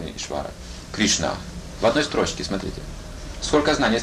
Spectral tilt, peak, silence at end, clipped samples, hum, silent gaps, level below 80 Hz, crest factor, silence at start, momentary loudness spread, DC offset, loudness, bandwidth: -3.5 dB/octave; -6 dBFS; 0 s; under 0.1%; none; none; -38 dBFS; 18 dB; 0 s; 17 LU; under 0.1%; -23 LUFS; 15 kHz